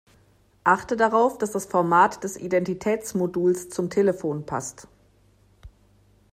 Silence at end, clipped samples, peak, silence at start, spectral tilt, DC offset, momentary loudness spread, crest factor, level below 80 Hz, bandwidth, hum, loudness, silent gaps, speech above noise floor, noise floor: 0.65 s; under 0.1%; -4 dBFS; 0.65 s; -5.5 dB/octave; under 0.1%; 10 LU; 20 dB; -58 dBFS; 15.5 kHz; none; -23 LUFS; none; 36 dB; -59 dBFS